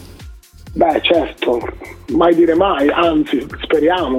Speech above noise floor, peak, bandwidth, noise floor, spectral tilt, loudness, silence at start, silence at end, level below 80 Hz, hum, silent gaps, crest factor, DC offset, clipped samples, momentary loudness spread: 22 dB; 0 dBFS; 13.5 kHz; -37 dBFS; -6 dB/octave; -15 LUFS; 0 s; 0 s; -38 dBFS; none; none; 14 dB; under 0.1%; under 0.1%; 9 LU